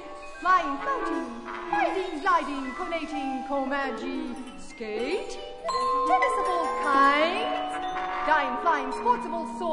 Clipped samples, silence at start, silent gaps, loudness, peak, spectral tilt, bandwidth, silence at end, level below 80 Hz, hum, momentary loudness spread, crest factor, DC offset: under 0.1%; 0 s; none; -27 LUFS; -8 dBFS; -3.5 dB/octave; 11 kHz; 0 s; -52 dBFS; none; 12 LU; 18 dB; under 0.1%